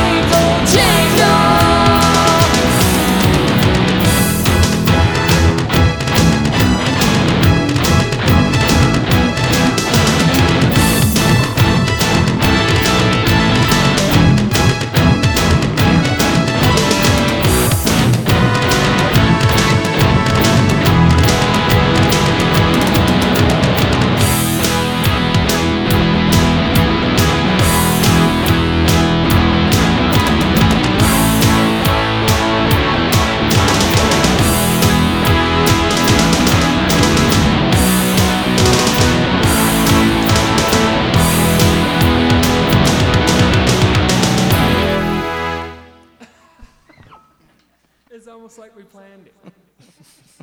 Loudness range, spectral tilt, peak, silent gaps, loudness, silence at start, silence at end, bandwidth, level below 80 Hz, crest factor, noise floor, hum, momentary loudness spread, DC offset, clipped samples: 1 LU; -4.5 dB/octave; 0 dBFS; none; -12 LUFS; 0 s; 3.75 s; over 20 kHz; -26 dBFS; 12 dB; -59 dBFS; none; 2 LU; under 0.1%; under 0.1%